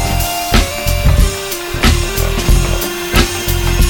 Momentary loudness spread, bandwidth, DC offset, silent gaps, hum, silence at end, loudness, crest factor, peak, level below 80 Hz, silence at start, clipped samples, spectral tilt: 3 LU; 18 kHz; under 0.1%; none; none; 0 s; -14 LUFS; 12 dB; 0 dBFS; -16 dBFS; 0 s; under 0.1%; -4 dB/octave